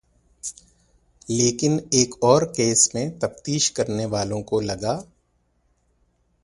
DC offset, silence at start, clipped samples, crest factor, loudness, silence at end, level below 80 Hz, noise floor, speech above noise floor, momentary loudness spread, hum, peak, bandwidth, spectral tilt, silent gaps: under 0.1%; 0.45 s; under 0.1%; 24 dB; -21 LUFS; 1.4 s; -54 dBFS; -67 dBFS; 45 dB; 13 LU; 60 Hz at -50 dBFS; 0 dBFS; 11.5 kHz; -4 dB/octave; none